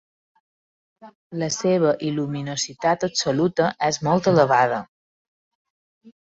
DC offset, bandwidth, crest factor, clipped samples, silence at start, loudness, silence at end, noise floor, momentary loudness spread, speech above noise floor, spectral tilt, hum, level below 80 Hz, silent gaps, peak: under 0.1%; 8.2 kHz; 20 dB; under 0.1%; 1.05 s; -21 LUFS; 0.15 s; under -90 dBFS; 9 LU; over 69 dB; -4.5 dB/octave; none; -60 dBFS; 1.15-1.30 s, 4.88-6.01 s; -4 dBFS